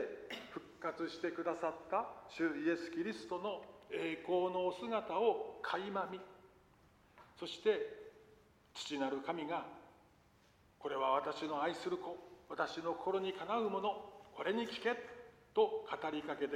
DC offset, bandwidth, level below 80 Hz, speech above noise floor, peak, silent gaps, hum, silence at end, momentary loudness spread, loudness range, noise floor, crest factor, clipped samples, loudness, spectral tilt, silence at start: under 0.1%; 12.5 kHz; -78 dBFS; 30 dB; -20 dBFS; none; none; 0 s; 13 LU; 4 LU; -69 dBFS; 20 dB; under 0.1%; -40 LUFS; -5 dB/octave; 0 s